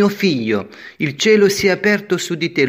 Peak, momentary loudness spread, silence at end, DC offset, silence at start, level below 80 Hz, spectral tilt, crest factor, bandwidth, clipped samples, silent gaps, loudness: -2 dBFS; 10 LU; 0 s; under 0.1%; 0 s; -56 dBFS; -4.5 dB/octave; 14 dB; 16 kHz; under 0.1%; none; -16 LUFS